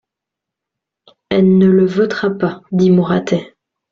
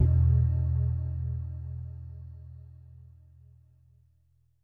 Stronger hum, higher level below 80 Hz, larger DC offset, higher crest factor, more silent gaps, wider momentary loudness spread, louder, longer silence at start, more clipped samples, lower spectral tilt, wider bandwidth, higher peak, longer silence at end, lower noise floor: neither; second, -52 dBFS vs -36 dBFS; neither; second, 12 dB vs 18 dB; neither; second, 9 LU vs 25 LU; first, -14 LUFS vs -29 LUFS; first, 1.3 s vs 0 s; neither; second, -8 dB/octave vs -12.5 dB/octave; first, 7 kHz vs 1.9 kHz; first, -2 dBFS vs -12 dBFS; second, 0.45 s vs 1.7 s; first, -82 dBFS vs -68 dBFS